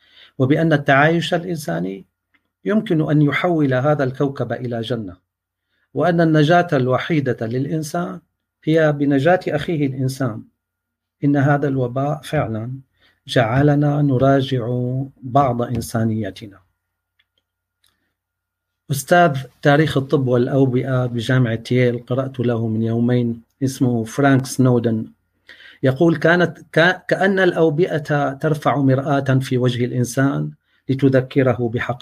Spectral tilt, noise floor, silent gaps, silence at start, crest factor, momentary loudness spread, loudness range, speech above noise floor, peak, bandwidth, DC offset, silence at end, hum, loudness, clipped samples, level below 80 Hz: -7 dB/octave; -80 dBFS; none; 0.4 s; 16 dB; 10 LU; 4 LU; 62 dB; -2 dBFS; 15.5 kHz; under 0.1%; 0.05 s; none; -18 LUFS; under 0.1%; -54 dBFS